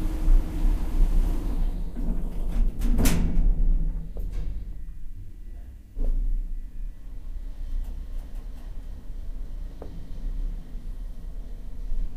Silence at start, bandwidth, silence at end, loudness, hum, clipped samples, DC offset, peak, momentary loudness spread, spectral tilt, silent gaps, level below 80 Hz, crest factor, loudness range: 0 s; 15 kHz; 0 s; -32 LUFS; none; under 0.1%; under 0.1%; -6 dBFS; 16 LU; -6 dB/octave; none; -26 dBFS; 20 dB; 12 LU